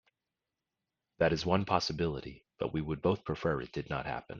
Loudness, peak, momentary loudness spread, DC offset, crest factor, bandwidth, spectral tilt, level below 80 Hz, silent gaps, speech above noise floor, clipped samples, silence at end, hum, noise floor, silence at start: -33 LUFS; -12 dBFS; 8 LU; under 0.1%; 22 dB; 7.2 kHz; -6 dB/octave; -56 dBFS; none; 56 dB; under 0.1%; 0 s; none; -89 dBFS; 1.2 s